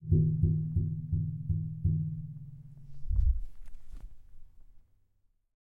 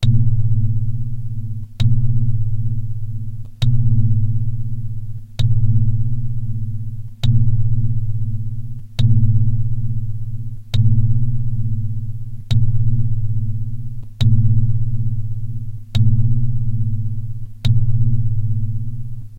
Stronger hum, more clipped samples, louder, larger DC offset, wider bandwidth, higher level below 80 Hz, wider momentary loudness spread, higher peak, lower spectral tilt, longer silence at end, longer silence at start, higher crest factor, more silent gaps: neither; neither; second, -32 LUFS vs -20 LUFS; neither; second, 0.8 kHz vs 5 kHz; second, -38 dBFS vs -26 dBFS; first, 24 LU vs 12 LU; second, -14 dBFS vs -2 dBFS; first, -13 dB/octave vs -8 dB/octave; first, 0.9 s vs 0 s; about the same, 0 s vs 0 s; first, 18 dB vs 12 dB; neither